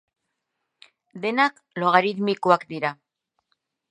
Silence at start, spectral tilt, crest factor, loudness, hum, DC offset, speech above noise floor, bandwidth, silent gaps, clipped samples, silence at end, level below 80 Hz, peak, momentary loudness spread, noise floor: 1.15 s; -6 dB/octave; 24 dB; -22 LUFS; none; under 0.1%; 57 dB; 10 kHz; none; under 0.1%; 0.95 s; -78 dBFS; -2 dBFS; 9 LU; -80 dBFS